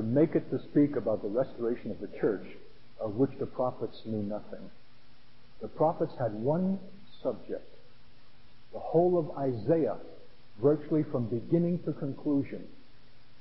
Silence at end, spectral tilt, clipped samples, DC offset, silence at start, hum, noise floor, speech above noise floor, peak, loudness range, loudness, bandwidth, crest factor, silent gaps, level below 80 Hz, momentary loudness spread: 0.7 s; -12 dB/octave; under 0.1%; 0.7%; 0 s; none; -60 dBFS; 30 dB; -14 dBFS; 5 LU; -31 LUFS; 5.8 kHz; 18 dB; none; -64 dBFS; 15 LU